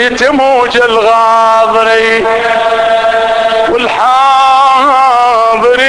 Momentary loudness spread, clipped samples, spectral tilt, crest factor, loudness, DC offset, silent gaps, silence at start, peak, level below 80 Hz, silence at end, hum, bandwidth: 4 LU; 0.6%; -2.5 dB/octave; 8 dB; -7 LUFS; under 0.1%; none; 0 s; 0 dBFS; -42 dBFS; 0 s; none; 11 kHz